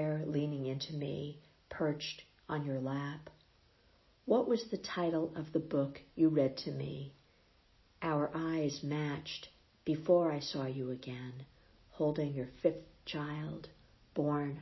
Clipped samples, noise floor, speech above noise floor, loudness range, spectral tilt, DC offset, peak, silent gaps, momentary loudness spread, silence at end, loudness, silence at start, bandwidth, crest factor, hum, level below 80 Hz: under 0.1%; -68 dBFS; 33 dB; 5 LU; -6 dB/octave; under 0.1%; -16 dBFS; none; 16 LU; 0 s; -37 LUFS; 0 s; 6 kHz; 20 dB; none; -68 dBFS